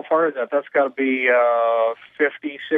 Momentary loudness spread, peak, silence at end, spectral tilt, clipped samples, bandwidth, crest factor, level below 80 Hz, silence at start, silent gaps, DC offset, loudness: 7 LU; -6 dBFS; 0 s; -6.5 dB/octave; under 0.1%; 3.8 kHz; 14 dB; -82 dBFS; 0.05 s; none; under 0.1%; -20 LUFS